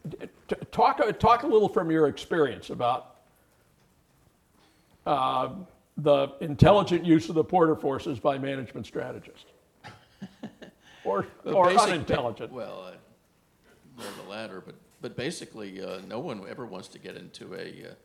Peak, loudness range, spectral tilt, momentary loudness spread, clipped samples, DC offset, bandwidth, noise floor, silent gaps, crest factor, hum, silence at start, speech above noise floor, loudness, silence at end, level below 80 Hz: -2 dBFS; 14 LU; -6 dB/octave; 21 LU; under 0.1%; under 0.1%; 14 kHz; -65 dBFS; none; 26 dB; none; 0.05 s; 39 dB; -26 LUFS; 0.1 s; -52 dBFS